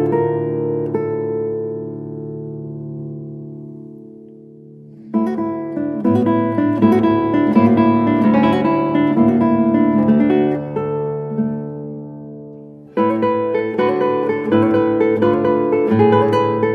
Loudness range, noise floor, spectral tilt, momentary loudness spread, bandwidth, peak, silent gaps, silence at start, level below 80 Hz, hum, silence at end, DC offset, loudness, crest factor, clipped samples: 12 LU; -40 dBFS; -9.5 dB/octave; 16 LU; 5.2 kHz; 0 dBFS; none; 0 s; -52 dBFS; none; 0 s; under 0.1%; -16 LUFS; 16 dB; under 0.1%